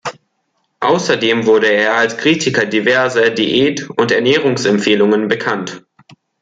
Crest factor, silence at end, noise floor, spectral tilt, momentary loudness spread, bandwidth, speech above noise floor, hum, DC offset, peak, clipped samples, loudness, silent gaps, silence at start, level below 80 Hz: 14 dB; 0.65 s; -66 dBFS; -4 dB/octave; 5 LU; 9.2 kHz; 53 dB; none; under 0.1%; 0 dBFS; under 0.1%; -13 LUFS; none; 0.05 s; -58 dBFS